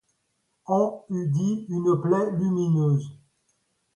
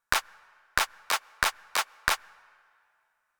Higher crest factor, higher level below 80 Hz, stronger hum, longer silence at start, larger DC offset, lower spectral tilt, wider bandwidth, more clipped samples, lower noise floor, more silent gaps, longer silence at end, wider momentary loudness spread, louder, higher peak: second, 16 dB vs 28 dB; second, -68 dBFS vs -52 dBFS; neither; first, 0.7 s vs 0.1 s; neither; first, -9 dB/octave vs 0.5 dB/octave; second, 10 kHz vs over 20 kHz; neither; about the same, -74 dBFS vs -74 dBFS; neither; second, 0.8 s vs 1.25 s; about the same, 6 LU vs 4 LU; first, -25 LUFS vs -29 LUFS; second, -10 dBFS vs -4 dBFS